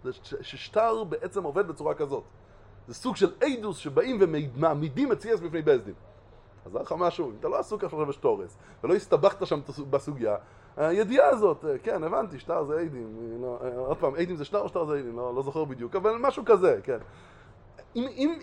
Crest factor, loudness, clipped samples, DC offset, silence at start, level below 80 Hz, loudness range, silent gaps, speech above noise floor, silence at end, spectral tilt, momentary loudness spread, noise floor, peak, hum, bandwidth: 22 dB; -28 LUFS; under 0.1%; under 0.1%; 0.05 s; -58 dBFS; 4 LU; none; 25 dB; 0 s; -6.5 dB/octave; 13 LU; -53 dBFS; -6 dBFS; none; 11 kHz